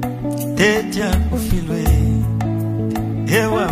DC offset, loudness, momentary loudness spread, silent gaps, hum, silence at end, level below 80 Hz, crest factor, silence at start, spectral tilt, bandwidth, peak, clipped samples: under 0.1%; -18 LUFS; 6 LU; none; none; 0 s; -24 dBFS; 18 dB; 0 s; -6 dB/octave; 15.5 kHz; 0 dBFS; under 0.1%